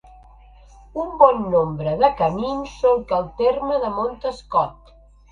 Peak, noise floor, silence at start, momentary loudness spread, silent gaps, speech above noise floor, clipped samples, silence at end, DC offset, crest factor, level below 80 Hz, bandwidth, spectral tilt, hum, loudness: 0 dBFS; -49 dBFS; 0.95 s; 12 LU; none; 29 dB; under 0.1%; 0.6 s; under 0.1%; 20 dB; -46 dBFS; 7.6 kHz; -7.5 dB/octave; 50 Hz at -45 dBFS; -20 LUFS